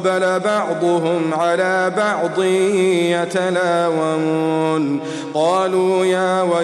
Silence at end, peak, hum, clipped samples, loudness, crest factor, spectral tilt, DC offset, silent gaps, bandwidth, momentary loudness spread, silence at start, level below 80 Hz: 0 s; -6 dBFS; none; under 0.1%; -17 LUFS; 10 dB; -5.5 dB/octave; under 0.1%; none; 12 kHz; 3 LU; 0 s; -68 dBFS